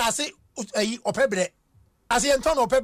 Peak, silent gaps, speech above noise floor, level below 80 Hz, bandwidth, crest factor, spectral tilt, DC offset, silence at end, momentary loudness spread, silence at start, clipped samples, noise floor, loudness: -12 dBFS; none; 38 dB; -48 dBFS; 15.5 kHz; 14 dB; -2.5 dB/octave; under 0.1%; 0 s; 9 LU; 0 s; under 0.1%; -61 dBFS; -24 LUFS